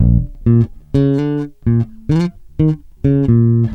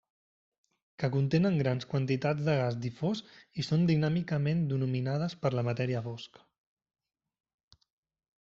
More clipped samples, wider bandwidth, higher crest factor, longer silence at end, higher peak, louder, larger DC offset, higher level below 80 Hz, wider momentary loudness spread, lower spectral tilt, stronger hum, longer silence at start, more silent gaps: neither; second, 5.8 kHz vs 7.4 kHz; second, 12 dB vs 18 dB; second, 0 s vs 2.15 s; first, -2 dBFS vs -14 dBFS; first, -16 LUFS vs -31 LUFS; neither; first, -26 dBFS vs -64 dBFS; second, 7 LU vs 10 LU; first, -10.5 dB/octave vs -7 dB/octave; neither; second, 0 s vs 1 s; neither